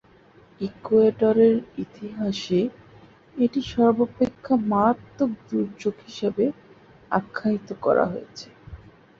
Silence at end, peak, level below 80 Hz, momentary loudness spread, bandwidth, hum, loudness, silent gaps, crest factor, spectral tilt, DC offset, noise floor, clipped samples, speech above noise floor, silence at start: 0.45 s; -6 dBFS; -56 dBFS; 15 LU; 7.4 kHz; none; -23 LUFS; none; 18 dB; -7 dB/octave; under 0.1%; -53 dBFS; under 0.1%; 31 dB; 0.6 s